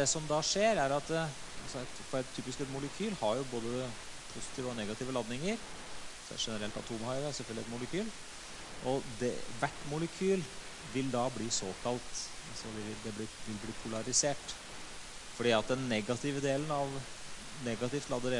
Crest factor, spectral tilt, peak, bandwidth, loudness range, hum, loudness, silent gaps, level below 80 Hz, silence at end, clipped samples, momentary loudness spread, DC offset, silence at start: 22 dB; -3.5 dB/octave; -14 dBFS; 11.5 kHz; 5 LU; none; -36 LUFS; none; -56 dBFS; 0 s; under 0.1%; 14 LU; under 0.1%; 0 s